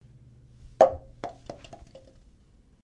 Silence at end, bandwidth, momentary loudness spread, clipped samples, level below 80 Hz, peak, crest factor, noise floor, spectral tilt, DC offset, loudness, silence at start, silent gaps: 1.3 s; 9.2 kHz; 26 LU; under 0.1%; -54 dBFS; -4 dBFS; 26 dB; -58 dBFS; -5.5 dB/octave; under 0.1%; -24 LUFS; 0.8 s; none